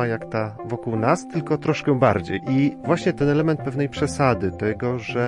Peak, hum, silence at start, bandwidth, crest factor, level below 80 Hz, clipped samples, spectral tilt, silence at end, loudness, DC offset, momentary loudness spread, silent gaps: -4 dBFS; none; 0 s; 11 kHz; 18 dB; -52 dBFS; under 0.1%; -7 dB/octave; 0 s; -22 LUFS; under 0.1%; 7 LU; none